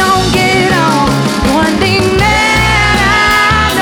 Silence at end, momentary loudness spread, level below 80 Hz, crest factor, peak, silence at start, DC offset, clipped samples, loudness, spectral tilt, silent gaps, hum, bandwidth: 0 s; 3 LU; -22 dBFS; 8 dB; -2 dBFS; 0 s; 0.3%; under 0.1%; -9 LUFS; -4 dB/octave; none; none; 20 kHz